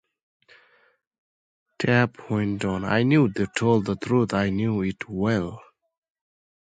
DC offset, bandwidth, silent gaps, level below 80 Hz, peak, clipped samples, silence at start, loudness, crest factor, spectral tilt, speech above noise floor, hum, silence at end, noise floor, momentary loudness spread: under 0.1%; 9.2 kHz; none; -52 dBFS; -4 dBFS; under 0.1%; 1.8 s; -24 LUFS; 20 dB; -7 dB/octave; 38 dB; none; 1.05 s; -61 dBFS; 7 LU